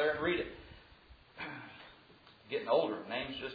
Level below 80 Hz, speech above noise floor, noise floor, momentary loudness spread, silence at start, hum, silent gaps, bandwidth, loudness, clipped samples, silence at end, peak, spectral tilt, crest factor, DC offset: -64 dBFS; 26 dB; -61 dBFS; 24 LU; 0 s; none; none; 5 kHz; -36 LUFS; under 0.1%; 0 s; -18 dBFS; -2.5 dB/octave; 20 dB; under 0.1%